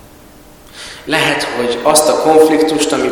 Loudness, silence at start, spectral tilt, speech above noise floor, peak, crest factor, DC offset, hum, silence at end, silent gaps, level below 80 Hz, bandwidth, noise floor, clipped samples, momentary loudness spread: -12 LUFS; 0.75 s; -3 dB/octave; 28 dB; 0 dBFS; 14 dB; under 0.1%; none; 0 s; none; -46 dBFS; over 20 kHz; -39 dBFS; 0.4%; 17 LU